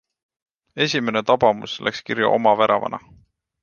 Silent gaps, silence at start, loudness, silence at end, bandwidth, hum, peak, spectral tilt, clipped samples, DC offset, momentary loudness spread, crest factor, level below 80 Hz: none; 0.75 s; -20 LUFS; 0.65 s; 7.2 kHz; none; -2 dBFS; -4.5 dB/octave; under 0.1%; under 0.1%; 11 LU; 20 dB; -60 dBFS